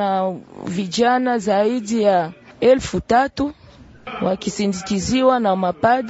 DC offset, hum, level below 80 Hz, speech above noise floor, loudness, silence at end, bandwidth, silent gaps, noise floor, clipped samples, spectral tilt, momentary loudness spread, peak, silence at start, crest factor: under 0.1%; none; -46 dBFS; 20 dB; -19 LUFS; 0 s; 8 kHz; none; -38 dBFS; under 0.1%; -5 dB/octave; 10 LU; -2 dBFS; 0 s; 16 dB